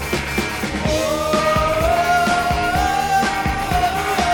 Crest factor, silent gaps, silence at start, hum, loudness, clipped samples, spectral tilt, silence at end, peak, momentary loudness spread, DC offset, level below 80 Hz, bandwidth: 14 dB; none; 0 s; none; -18 LUFS; under 0.1%; -4 dB/octave; 0 s; -4 dBFS; 5 LU; under 0.1%; -30 dBFS; 19 kHz